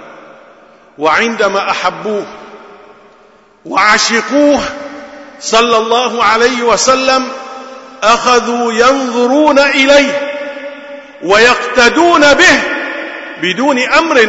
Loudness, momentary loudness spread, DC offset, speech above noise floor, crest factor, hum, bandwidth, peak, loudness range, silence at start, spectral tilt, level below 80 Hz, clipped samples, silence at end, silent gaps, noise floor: -10 LUFS; 17 LU; under 0.1%; 35 dB; 12 dB; none; 11 kHz; 0 dBFS; 5 LU; 0 s; -2 dB/octave; -44 dBFS; 0.1%; 0 s; none; -44 dBFS